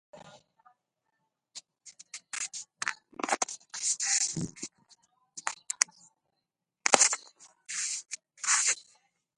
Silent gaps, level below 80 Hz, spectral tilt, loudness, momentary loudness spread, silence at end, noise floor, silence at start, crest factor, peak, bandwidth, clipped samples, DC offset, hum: none; -72 dBFS; 0 dB/octave; -29 LUFS; 20 LU; 0.55 s; -85 dBFS; 0.15 s; 32 dB; -2 dBFS; 12 kHz; under 0.1%; under 0.1%; none